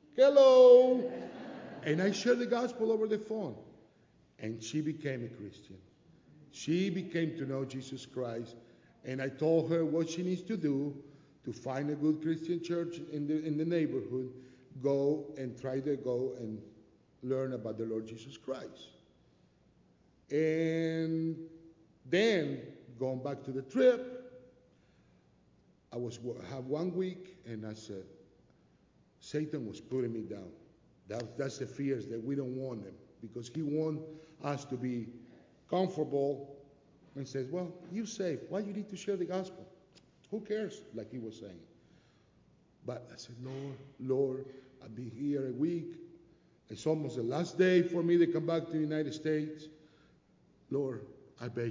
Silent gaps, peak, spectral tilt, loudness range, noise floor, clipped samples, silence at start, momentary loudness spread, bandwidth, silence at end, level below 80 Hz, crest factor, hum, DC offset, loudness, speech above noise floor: none; -12 dBFS; -6.5 dB/octave; 9 LU; -67 dBFS; under 0.1%; 0.15 s; 18 LU; 7.6 kHz; 0 s; -74 dBFS; 22 dB; none; under 0.1%; -33 LUFS; 34 dB